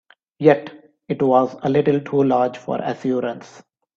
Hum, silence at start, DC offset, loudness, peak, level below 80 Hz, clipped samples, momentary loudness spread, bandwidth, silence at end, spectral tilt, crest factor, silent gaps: none; 0.4 s; under 0.1%; -19 LUFS; 0 dBFS; -62 dBFS; under 0.1%; 12 LU; 7.4 kHz; 0.55 s; -8 dB/octave; 20 dB; none